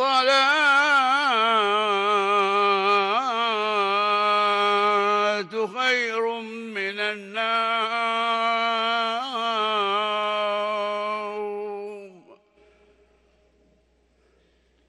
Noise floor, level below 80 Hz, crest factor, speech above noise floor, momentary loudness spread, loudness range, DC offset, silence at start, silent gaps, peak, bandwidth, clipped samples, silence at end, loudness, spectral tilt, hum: -63 dBFS; -72 dBFS; 14 dB; 40 dB; 11 LU; 11 LU; under 0.1%; 0 s; none; -10 dBFS; 12 kHz; under 0.1%; 2.55 s; -22 LUFS; -2.5 dB/octave; none